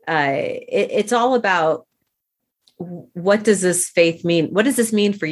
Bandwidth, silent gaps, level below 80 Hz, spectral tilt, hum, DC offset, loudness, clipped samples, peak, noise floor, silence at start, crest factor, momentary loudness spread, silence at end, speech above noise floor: 14 kHz; none; -66 dBFS; -4 dB/octave; none; under 0.1%; -18 LUFS; under 0.1%; -2 dBFS; -78 dBFS; 0.05 s; 18 dB; 10 LU; 0 s; 60 dB